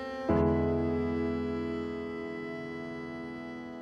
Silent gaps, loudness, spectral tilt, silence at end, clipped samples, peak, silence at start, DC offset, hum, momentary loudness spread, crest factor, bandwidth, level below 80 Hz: none; -33 LUFS; -8.5 dB/octave; 0 s; under 0.1%; -16 dBFS; 0 s; under 0.1%; none; 12 LU; 16 dB; 7.4 kHz; -48 dBFS